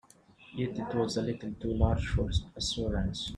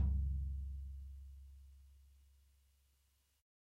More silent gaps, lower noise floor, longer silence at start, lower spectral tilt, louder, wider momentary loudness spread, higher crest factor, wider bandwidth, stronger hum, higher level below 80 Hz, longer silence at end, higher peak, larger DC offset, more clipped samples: neither; second, -58 dBFS vs -77 dBFS; first, 0.4 s vs 0 s; second, -5.5 dB/octave vs -9 dB/octave; first, -32 LUFS vs -45 LUFS; second, 7 LU vs 24 LU; about the same, 20 dB vs 18 dB; first, 10.5 kHz vs 1.2 kHz; neither; first, -40 dBFS vs -46 dBFS; second, 0 s vs 1.65 s; first, -12 dBFS vs -28 dBFS; neither; neither